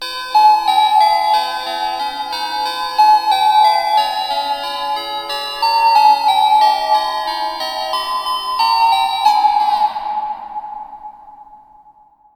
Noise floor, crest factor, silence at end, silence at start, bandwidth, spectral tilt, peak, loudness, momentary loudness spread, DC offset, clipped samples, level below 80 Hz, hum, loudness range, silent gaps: -48 dBFS; 14 dB; 0.8 s; 0 s; 17 kHz; 0 dB/octave; -2 dBFS; -15 LUFS; 10 LU; under 0.1%; under 0.1%; -54 dBFS; none; 2 LU; none